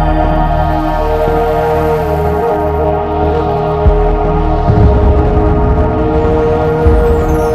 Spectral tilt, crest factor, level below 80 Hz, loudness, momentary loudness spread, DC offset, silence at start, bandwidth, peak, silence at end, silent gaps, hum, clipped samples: -9 dB/octave; 10 dB; -16 dBFS; -12 LUFS; 3 LU; under 0.1%; 0 s; 14 kHz; 0 dBFS; 0 s; none; none; under 0.1%